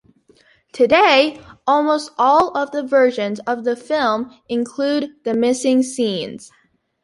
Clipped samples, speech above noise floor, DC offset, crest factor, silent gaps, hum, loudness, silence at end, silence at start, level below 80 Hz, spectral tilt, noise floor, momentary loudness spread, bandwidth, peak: under 0.1%; 37 dB; under 0.1%; 16 dB; none; none; -18 LUFS; 0.6 s; 0.75 s; -58 dBFS; -3.5 dB/octave; -54 dBFS; 11 LU; 11.5 kHz; -2 dBFS